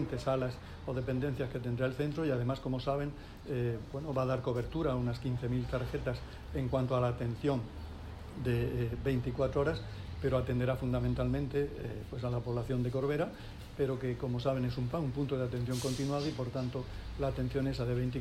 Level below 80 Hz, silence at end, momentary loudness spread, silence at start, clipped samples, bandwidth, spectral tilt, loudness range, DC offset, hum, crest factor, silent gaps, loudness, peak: -48 dBFS; 0 s; 7 LU; 0 s; under 0.1%; 14 kHz; -7.5 dB/octave; 2 LU; under 0.1%; none; 16 dB; none; -35 LUFS; -18 dBFS